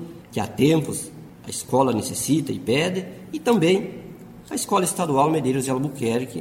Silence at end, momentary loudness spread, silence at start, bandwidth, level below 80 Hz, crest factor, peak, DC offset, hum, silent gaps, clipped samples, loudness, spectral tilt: 0 s; 14 LU; 0 s; 16.5 kHz; -56 dBFS; 18 dB; -6 dBFS; under 0.1%; none; none; under 0.1%; -22 LUFS; -5 dB/octave